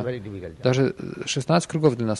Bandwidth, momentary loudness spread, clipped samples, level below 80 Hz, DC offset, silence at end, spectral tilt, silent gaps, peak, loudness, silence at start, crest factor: 11.5 kHz; 11 LU; under 0.1%; -56 dBFS; under 0.1%; 0 s; -5.5 dB/octave; none; -6 dBFS; -24 LUFS; 0 s; 18 dB